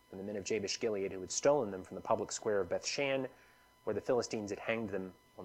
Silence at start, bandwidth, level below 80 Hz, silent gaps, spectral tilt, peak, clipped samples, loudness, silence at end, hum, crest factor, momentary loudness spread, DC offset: 0.1 s; 15 kHz; -72 dBFS; none; -3.5 dB/octave; -18 dBFS; under 0.1%; -36 LUFS; 0 s; none; 20 dB; 11 LU; under 0.1%